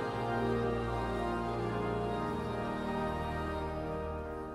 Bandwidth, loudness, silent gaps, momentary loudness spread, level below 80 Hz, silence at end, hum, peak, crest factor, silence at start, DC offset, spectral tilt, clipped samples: 13.5 kHz; -35 LUFS; none; 5 LU; -46 dBFS; 0 s; none; -20 dBFS; 14 dB; 0 s; under 0.1%; -7.5 dB/octave; under 0.1%